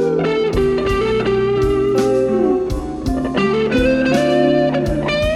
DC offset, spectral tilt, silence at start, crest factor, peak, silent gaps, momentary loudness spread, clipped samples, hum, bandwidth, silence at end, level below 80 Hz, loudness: under 0.1%; -6.5 dB/octave; 0 s; 14 dB; -2 dBFS; none; 5 LU; under 0.1%; none; 13 kHz; 0 s; -30 dBFS; -16 LUFS